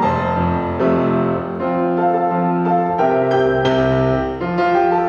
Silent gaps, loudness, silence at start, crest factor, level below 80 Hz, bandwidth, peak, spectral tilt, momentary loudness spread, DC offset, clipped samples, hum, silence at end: none; -17 LUFS; 0 s; 12 dB; -40 dBFS; 7 kHz; -4 dBFS; -8.5 dB/octave; 4 LU; under 0.1%; under 0.1%; none; 0 s